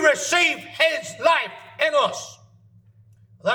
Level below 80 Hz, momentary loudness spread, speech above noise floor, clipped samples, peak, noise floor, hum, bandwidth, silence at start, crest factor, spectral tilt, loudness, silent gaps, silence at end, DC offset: -72 dBFS; 13 LU; 32 dB; under 0.1%; -4 dBFS; -53 dBFS; none; 20 kHz; 0 s; 18 dB; -1.5 dB/octave; -21 LUFS; none; 0 s; under 0.1%